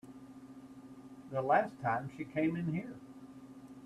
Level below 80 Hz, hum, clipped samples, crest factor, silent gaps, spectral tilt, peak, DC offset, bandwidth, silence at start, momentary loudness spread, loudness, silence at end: -72 dBFS; none; under 0.1%; 22 dB; none; -8 dB/octave; -16 dBFS; under 0.1%; 12.5 kHz; 0.05 s; 22 LU; -35 LUFS; 0 s